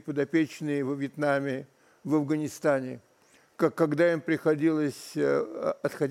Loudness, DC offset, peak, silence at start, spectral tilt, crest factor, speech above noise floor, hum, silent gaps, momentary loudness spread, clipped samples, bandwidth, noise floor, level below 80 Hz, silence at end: -28 LUFS; under 0.1%; -12 dBFS; 0.05 s; -6.5 dB/octave; 16 dB; 35 dB; none; none; 7 LU; under 0.1%; 14.5 kHz; -62 dBFS; -78 dBFS; 0 s